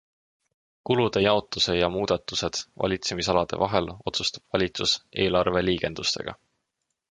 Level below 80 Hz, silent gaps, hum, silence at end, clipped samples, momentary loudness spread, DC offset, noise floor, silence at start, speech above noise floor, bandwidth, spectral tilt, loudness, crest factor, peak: -50 dBFS; none; none; 0.75 s; under 0.1%; 6 LU; under 0.1%; -80 dBFS; 0.85 s; 55 dB; 9.6 kHz; -4 dB/octave; -25 LUFS; 22 dB; -4 dBFS